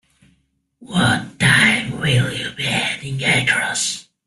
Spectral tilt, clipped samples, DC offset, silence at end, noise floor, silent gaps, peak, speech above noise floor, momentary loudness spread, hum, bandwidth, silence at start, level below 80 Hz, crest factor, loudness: -3.5 dB/octave; under 0.1%; under 0.1%; 0.25 s; -64 dBFS; none; -2 dBFS; 46 dB; 10 LU; none; 12.5 kHz; 0.8 s; -48 dBFS; 18 dB; -17 LUFS